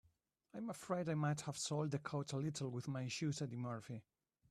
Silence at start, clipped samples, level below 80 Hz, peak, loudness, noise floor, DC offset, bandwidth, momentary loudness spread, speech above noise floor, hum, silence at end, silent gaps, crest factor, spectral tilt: 0.55 s; under 0.1%; -78 dBFS; -28 dBFS; -43 LUFS; -79 dBFS; under 0.1%; 13 kHz; 10 LU; 36 dB; none; 0.5 s; none; 16 dB; -5.5 dB/octave